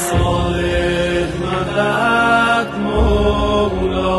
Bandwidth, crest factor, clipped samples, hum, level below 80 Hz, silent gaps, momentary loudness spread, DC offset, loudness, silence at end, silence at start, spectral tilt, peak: 12.5 kHz; 12 dB; under 0.1%; none; -24 dBFS; none; 6 LU; under 0.1%; -16 LUFS; 0 s; 0 s; -5.5 dB/octave; -4 dBFS